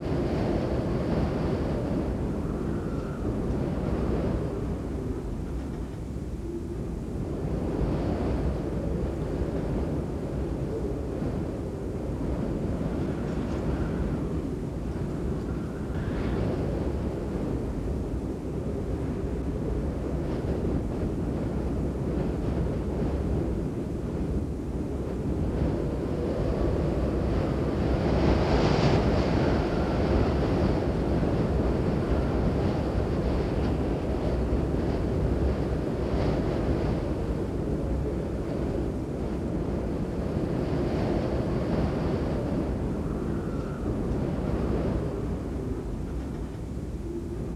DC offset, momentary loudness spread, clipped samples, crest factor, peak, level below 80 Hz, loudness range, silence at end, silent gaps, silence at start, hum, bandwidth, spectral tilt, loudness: under 0.1%; 7 LU; under 0.1%; 18 dB; -10 dBFS; -34 dBFS; 6 LU; 0 s; none; 0 s; none; 12 kHz; -8.5 dB/octave; -29 LUFS